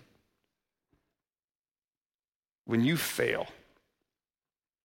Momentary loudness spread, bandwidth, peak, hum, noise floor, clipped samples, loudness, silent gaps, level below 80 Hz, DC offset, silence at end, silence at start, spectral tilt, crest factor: 15 LU; 16.5 kHz; -14 dBFS; none; under -90 dBFS; under 0.1%; -30 LUFS; none; -70 dBFS; under 0.1%; 1.3 s; 2.65 s; -5 dB/octave; 22 dB